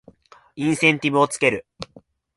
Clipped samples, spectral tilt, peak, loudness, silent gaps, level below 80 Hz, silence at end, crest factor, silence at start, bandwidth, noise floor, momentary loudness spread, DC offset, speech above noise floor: under 0.1%; -4.5 dB/octave; -4 dBFS; -20 LUFS; none; -60 dBFS; 0.55 s; 20 dB; 0.55 s; 11.5 kHz; -52 dBFS; 21 LU; under 0.1%; 33 dB